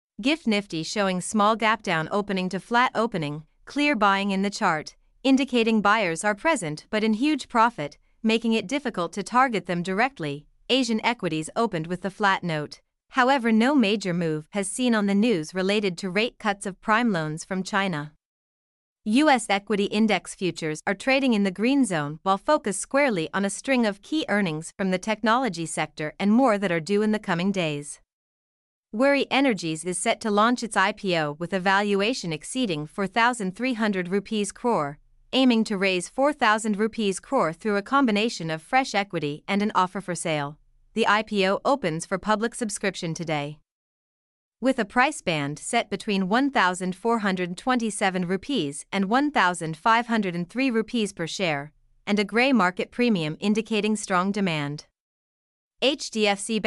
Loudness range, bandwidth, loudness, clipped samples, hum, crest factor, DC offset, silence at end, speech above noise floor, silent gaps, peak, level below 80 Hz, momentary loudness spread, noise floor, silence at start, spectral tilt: 3 LU; 12 kHz; -24 LUFS; under 0.1%; none; 18 dB; under 0.1%; 0 s; over 66 dB; 18.25-18.96 s, 28.13-28.84 s, 43.71-44.51 s, 55.00-55.71 s; -6 dBFS; -60 dBFS; 8 LU; under -90 dBFS; 0.2 s; -4.5 dB/octave